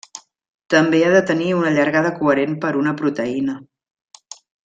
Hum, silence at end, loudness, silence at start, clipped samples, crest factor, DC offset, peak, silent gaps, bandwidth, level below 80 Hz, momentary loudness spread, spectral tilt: none; 1 s; -18 LUFS; 0.15 s; under 0.1%; 16 dB; under 0.1%; -2 dBFS; 0.50-0.59 s; 8.8 kHz; -60 dBFS; 21 LU; -6 dB/octave